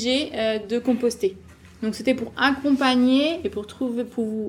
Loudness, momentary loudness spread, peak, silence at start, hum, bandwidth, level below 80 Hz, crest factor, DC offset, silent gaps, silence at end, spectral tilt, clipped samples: -23 LUFS; 10 LU; -6 dBFS; 0 s; none; 13.5 kHz; -56 dBFS; 16 dB; under 0.1%; none; 0 s; -4.5 dB/octave; under 0.1%